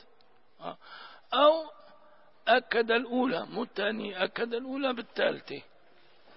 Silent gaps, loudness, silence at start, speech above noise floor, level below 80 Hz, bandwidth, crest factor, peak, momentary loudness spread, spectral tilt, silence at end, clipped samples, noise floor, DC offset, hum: none; -29 LUFS; 0.6 s; 34 dB; -76 dBFS; 5.8 kHz; 20 dB; -10 dBFS; 20 LU; -7.5 dB/octave; 0.75 s; under 0.1%; -65 dBFS; 0.1%; none